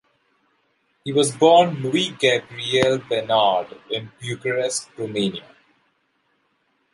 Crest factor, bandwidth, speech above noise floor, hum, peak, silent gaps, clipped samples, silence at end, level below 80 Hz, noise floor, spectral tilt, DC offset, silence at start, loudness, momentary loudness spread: 20 dB; 11.5 kHz; 47 dB; none; -2 dBFS; none; under 0.1%; 1.55 s; -64 dBFS; -68 dBFS; -4 dB/octave; under 0.1%; 1.05 s; -20 LUFS; 14 LU